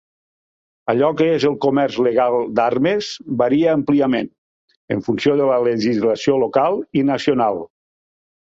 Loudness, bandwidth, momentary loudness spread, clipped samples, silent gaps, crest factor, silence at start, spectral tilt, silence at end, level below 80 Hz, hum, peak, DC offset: -18 LUFS; 7.8 kHz; 7 LU; under 0.1%; 4.38-4.68 s, 4.77-4.88 s; 16 dB; 0.85 s; -6.5 dB/octave; 0.85 s; -58 dBFS; none; -2 dBFS; under 0.1%